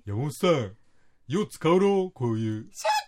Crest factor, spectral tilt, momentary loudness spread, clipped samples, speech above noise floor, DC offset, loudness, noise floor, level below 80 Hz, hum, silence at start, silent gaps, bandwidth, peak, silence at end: 16 dB; -6 dB/octave; 10 LU; under 0.1%; 32 dB; under 0.1%; -26 LUFS; -57 dBFS; -66 dBFS; none; 0.05 s; none; 16 kHz; -10 dBFS; 0 s